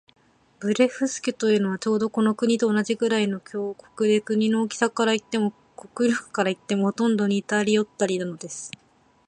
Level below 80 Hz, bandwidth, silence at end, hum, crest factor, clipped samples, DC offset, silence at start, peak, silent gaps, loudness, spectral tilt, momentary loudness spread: -70 dBFS; 10 kHz; 0.6 s; none; 18 dB; under 0.1%; under 0.1%; 0.6 s; -6 dBFS; none; -24 LUFS; -5 dB/octave; 10 LU